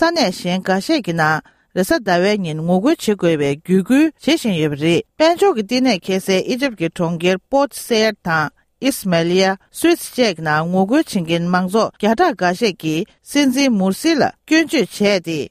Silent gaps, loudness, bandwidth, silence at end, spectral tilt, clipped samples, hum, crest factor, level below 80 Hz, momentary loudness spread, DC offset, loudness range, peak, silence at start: none; -17 LUFS; 15.5 kHz; 0.05 s; -5 dB/octave; under 0.1%; none; 14 dB; -54 dBFS; 5 LU; under 0.1%; 2 LU; -2 dBFS; 0 s